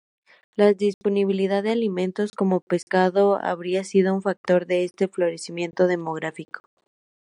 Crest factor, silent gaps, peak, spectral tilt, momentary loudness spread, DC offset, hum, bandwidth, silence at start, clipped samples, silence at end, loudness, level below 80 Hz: 18 dB; 0.94-1.01 s, 2.62-2.67 s, 2.83-2.87 s, 4.37-4.44 s; -4 dBFS; -6.5 dB/octave; 10 LU; under 0.1%; none; 11 kHz; 0.6 s; under 0.1%; 0.65 s; -23 LUFS; -74 dBFS